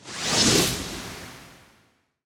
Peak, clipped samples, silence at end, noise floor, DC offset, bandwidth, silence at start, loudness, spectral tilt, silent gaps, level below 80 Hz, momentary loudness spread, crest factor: -6 dBFS; under 0.1%; 0.7 s; -64 dBFS; under 0.1%; over 20 kHz; 0.05 s; -21 LUFS; -2.5 dB/octave; none; -48 dBFS; 21 LU; 20 dB